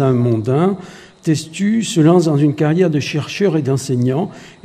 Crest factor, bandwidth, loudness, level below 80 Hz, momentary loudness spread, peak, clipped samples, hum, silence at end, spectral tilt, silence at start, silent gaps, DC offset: 16 dB; 14 kHz; -16 LUFS; -56 dBFS; 9 LU; 0 dBFS; under 0.1%; none; 0.15 s; -6.5 dB/octave; 0 s; none; under 0.1%